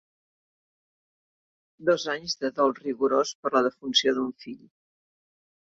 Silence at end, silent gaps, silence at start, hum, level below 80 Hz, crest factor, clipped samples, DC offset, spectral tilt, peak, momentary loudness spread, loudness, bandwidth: 1.2 s; 3.35-3.43 s; 1.8 s; none; -72 dBFS; 22 dB; under 0.1%; under 0.1%; -3 dB/octave; -8 dBFS; 11 LU; -26 LUFS; 7.8 kHz